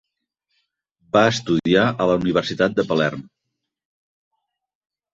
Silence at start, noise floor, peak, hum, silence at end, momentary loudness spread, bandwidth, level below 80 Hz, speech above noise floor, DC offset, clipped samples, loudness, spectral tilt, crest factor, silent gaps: 1.15 s; -80 dBFS; -2 dBFS; none; 1.9 s; 4 LU; 8.2 kHz; -54 dBFS; 61 dB; under 0.1%; under 0.1%; -19 LUFS; -5.5 dB/octave; 22 dB; none